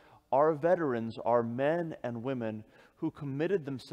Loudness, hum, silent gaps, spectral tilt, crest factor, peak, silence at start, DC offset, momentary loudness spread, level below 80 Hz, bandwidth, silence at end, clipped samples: -32 LUFS; none; none; -8 dB/octave; 18 dB; -14 dBFS; 0.3 s; under 0.1%; 11 LU; -72 dBFS; 9.6 kHz; 0 s; under 0.1%